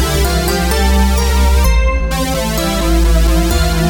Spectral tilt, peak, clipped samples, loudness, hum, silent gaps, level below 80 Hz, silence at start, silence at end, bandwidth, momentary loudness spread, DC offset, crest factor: -5 dB/octave; -2 dBFS; under 0.1%; -14 LUFS; none; none; -14 dBFS; 0 s; 0 s; 17.5 kHz; 3 LU; under 0.1%; 10 dB